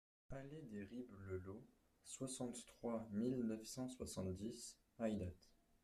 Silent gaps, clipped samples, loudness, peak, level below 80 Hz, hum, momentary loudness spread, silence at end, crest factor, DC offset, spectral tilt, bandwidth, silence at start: none; under 0.1%; -49 LUFS; -30 dBFS; -72 dBFS; none; 13 LU; 0.35 s; 18 dB; under 0.1%; -5.5 dB/octave; 14 kHz; 0.3 s